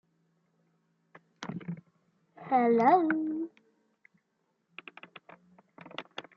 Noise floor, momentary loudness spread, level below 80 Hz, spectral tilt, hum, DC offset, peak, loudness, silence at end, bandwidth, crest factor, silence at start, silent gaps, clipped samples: -78 dBFS; 27 LU; -82 dBFS; -7 dB/octave; none; under 0.1%; -10 dBFS; -28 LUFS; 0.15 s; 7 kHz; 22 dB; 1.4 s; none; under 0.1%